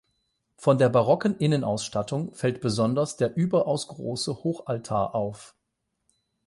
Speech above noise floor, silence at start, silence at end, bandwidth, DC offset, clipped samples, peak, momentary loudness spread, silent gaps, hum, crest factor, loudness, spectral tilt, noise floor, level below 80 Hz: 54 dB; 0.6 s; 1 s; 11.5 kHz; under 0.1%; under 0.1%; -8 dBFS; 10 LU; none; none; 18 dB; -26 LUFS; -6 dB/octave; -79 dBFS; -60 dBFS